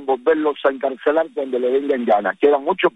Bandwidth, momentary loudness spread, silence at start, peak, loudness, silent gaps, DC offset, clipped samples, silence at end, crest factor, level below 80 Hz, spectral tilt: 4 kHz; 4 LU; 0 s; -4 dBFS; -19 LUFS; none; under 0.1%; under 0.1%; 0.05 s; 14 dB; -64 dBFS; -6.5 dB/octave